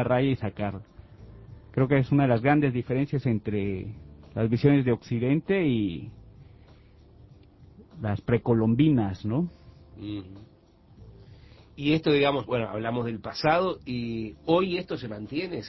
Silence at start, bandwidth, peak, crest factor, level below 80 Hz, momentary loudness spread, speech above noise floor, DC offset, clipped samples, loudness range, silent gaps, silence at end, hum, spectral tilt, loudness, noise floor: 0 s; 6 kHz; -8 dBFS; 18 dB; -52 dBFS; 14 LU; 30 dB; under 0.1%; under 0.1%; 5 LU; none; 0 s; none; -8.5 dB/octave; -26 LUFS; -55 dBFS